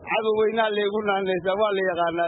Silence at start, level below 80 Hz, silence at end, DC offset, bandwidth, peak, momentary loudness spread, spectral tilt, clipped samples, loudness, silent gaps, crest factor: 0 s; -62 dBFS; 0 s; under 0.1%; 4.1 kHz; -10 dBFS; 3 LU; -9.5 dB/octave; under 0.1%; -23 LUFS; none; 14 dB